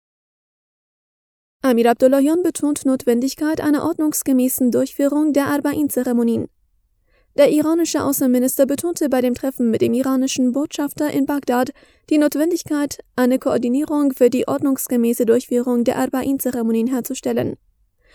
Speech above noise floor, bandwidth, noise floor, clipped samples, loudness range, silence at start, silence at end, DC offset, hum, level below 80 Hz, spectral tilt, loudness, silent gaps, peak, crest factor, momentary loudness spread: 44 dB; 20 kHz; -62 dBFS; under 0.1%; 2 LU; 1.65 s; 0.6 s; under 0.1%; none; -56 dBFS; -4.5 dB/octave; -18 LUFS; none; -2 dBFS; 16 dB; 6 LU